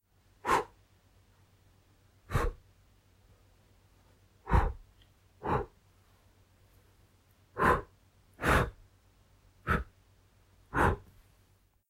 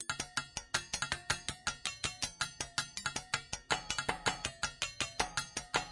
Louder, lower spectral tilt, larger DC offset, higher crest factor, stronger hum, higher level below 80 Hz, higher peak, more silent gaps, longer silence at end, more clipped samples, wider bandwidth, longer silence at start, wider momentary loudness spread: first, -32 LUFS vs -37 LUFS; first, -6 dB/octave vs -1 dB/octave; neither; about the same, 24 dB vs 24 dB; neither; first, -42 dBFS vs -58 dBFS; about the same, -12 dBFS vs -14 dBFS; neither; first, 0.9 s vs 0 s; neither; first, 16 kHz vs 11.5 kHz; first, 0.45 s vs 0 s; first, 19 LU vs 3 LU